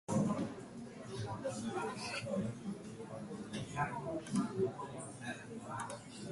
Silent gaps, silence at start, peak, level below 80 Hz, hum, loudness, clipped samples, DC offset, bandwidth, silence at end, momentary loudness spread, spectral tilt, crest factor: none; 0.1 s; -22 dBFS; -68 dBFS; none; -41 LUFS; under 0.1%; under 0.1%; 11.5 kHz; 0 s; 10 LU; -5.5 dB/octave; 18 dB